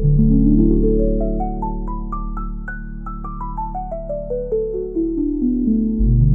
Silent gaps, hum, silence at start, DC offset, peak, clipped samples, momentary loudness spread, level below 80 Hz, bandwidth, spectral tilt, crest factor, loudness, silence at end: none; none; 0 s; under 0.1%; -4 dBFS; under 0.1%; 15 LU; -22 dBFS; 1.7 kHz; -14.5 dB/octave; 14 dB; -20 LUFS; 0 s